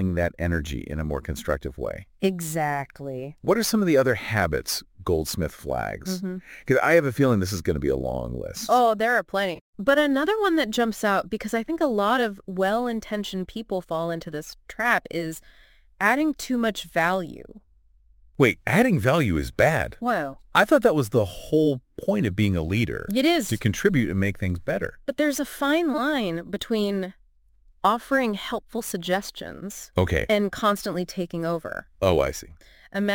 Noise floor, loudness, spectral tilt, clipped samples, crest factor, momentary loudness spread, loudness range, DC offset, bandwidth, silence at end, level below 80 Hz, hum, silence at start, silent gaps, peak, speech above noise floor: -58 dBFS; -24 LUFS; -5.5 dB/octave; under 0.1%; 22 dB; 11 LU; 4 LU; under 0.1%; 17 kHz; 0 s; -44 dBFS; none; 0 s; 9.61-9.73 s; -2 dBFS; 34 dB